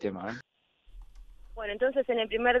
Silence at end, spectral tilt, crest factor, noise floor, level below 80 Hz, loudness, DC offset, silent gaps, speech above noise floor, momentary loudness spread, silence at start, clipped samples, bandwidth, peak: 0 s; -6 dB/octave; 18 dB; -52 dBFS; -52 dBFS; -30 LUFS; under 0.1%; none; 23 dB; 16 LU; 0 s; under 0.1%; 7 kHz; -12 dBFS